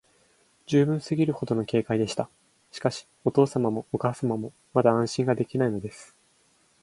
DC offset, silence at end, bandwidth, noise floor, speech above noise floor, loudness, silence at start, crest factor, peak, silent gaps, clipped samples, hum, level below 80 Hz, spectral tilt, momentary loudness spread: under 0.1%; 0.8 s; 11.5 kHz; -64 dBFS; 39 dB; -26 LUFS; 0.7 s; 22 dB; -6 dBFS; none; under 0.1%; none; -62 dBFS; -7 dB/octave; 9 LU